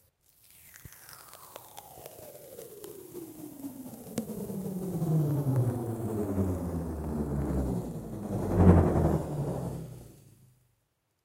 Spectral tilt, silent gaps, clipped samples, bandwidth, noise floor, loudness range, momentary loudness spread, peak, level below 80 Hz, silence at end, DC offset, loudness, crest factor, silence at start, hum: -8.5 dB/octave; none; under 0.1%; 16.5 kHz; -77 dBFS; 17 LU; 22 LU; -8 dBFS; -44 dBFS; 1.1 s; under 0.1%; -30 LUFS; 24 dB; 0.65 s; none